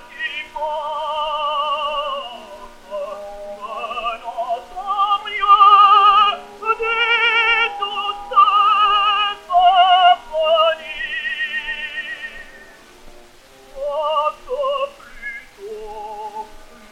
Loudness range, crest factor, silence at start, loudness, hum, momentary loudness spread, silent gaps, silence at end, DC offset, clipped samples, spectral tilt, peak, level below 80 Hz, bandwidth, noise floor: 12 LU; 18 dB; 0 s; -16 LUFS; none; 20 LU; none; 0.05 s; under 0.1%; under 0.1%; -1 dB/octave; 0 dBFS; -48 dBFS; 12 kHz; -45 dBFS